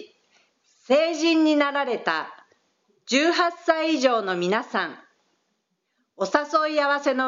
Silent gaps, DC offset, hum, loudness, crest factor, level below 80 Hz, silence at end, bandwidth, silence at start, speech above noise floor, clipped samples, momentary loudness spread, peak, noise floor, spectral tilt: none; under 0.1%; none; -22 LUFS; 22 dB; -90 dBFS; 0 s; 7.6 kHz; 0 s; 53 dB; under 0.1%; 8 LU; -2 dBFS; -75 dBFS; -1.5 dB/octave